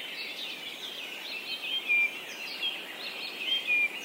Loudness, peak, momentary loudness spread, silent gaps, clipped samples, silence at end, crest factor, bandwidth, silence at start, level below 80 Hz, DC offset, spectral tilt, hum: -30 LUFS; -18 dBFS; 12 LU; none; under 0.1%; 0 s; 14 dB; 16 kHz; 0 s; -86 dBFS; under 0.1%; 0 dB/octave; none